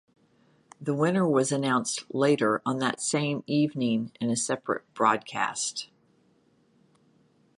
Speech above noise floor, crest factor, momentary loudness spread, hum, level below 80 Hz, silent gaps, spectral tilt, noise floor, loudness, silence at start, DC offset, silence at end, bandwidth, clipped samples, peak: 38 dB; 20 dB; 7 LU; none; -74 dBFS; none; -4.5 dB/octave; -65 dBFS; -27 LUFS; 0.8 s; under 0.1%; 1.75 s; 11.5 kHz; under 0.1%; -8 dBFS